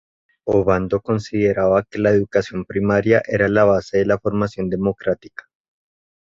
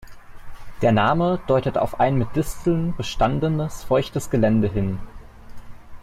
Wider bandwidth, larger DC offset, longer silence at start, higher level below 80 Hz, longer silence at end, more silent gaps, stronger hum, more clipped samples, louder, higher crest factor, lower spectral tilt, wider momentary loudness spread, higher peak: second, 7.6 kHz vs 15.5 kHz; neither; first, 0.45 s vs 0 s; second, -46 dBFS vs -38 dBFS; first, 1.15 s vs 0 s; neither; neither; neither; first, -19 LUFS vs -22 LUFS; about the same, 18 dB vs 16 dB; about the same, -7.5 dB/octave vs -7 dB/octave; about the same, 8 LU vs 7 LU; first, -2 dBFS vs -6 dBFS